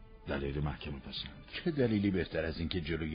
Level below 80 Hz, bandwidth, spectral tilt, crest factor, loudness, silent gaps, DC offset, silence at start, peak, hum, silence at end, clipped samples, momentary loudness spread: -48 dBFS; 5.2 kHz; -5.5 dB/octave; 18 dB; -36 LUFS; none; under 0.1%; 0 s; -18 dBFS; none; 0 s; under 0.1%; 11 LU